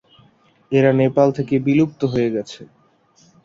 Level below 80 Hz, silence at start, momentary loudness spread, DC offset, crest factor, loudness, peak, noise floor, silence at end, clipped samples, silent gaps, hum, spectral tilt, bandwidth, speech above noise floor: -58 dBFS; 0.7 s; 11 LU; under 0.1%; 18 dB; -18 LUFS; -2 dBFS; -56 dBFS; 0.8 s; under 0.1%; none; none; -8 dB/octave; 7.6 kHz; 39 dB